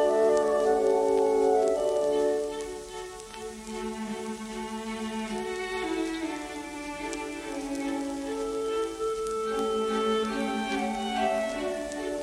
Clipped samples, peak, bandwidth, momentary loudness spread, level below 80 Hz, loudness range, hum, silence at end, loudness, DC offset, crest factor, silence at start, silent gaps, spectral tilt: under 0.1%; -12 dBFS; 14 kHz; 12 LU; -54 dBFS; 7 LU; none; 0 s; -29 LUFS; under 0.1%; 16 dB; 0 s; none; -4 dB/octave